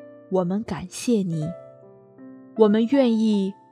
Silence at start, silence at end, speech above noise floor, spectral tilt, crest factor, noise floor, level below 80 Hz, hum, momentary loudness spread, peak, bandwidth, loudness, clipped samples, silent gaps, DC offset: 0 s; 0.2 s; 27 dB; -6.5 dB/octave; 18 dB; -48 dBFS; -62 dBFS; none; 13 LU; -4 dBFS; 13.5 kHz; -22 LUFS; under 0.1%; none; under 0.1%